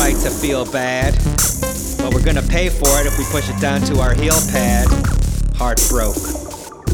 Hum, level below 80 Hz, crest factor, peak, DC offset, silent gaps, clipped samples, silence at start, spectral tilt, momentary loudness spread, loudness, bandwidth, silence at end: none; -20 dBFS; 14 dB; -2 dBFS; under 0.1%; none; under 0.1%; 0 s; -4 dB/octave; 7 LU; -17 LUFS; 19 kHz; 0 s